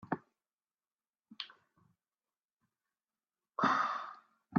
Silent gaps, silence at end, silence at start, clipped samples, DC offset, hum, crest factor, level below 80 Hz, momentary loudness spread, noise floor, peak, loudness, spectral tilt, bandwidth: 2.52-2.57 s; 0 s; 0.1 s; under 0.1%; under 0.1%; none; 26 dB; -86 dBFS; 16 LU; under -90 dBFS; -16 dBFS; -35 LUFS; -3.5 dB/octave; 7.6 kHz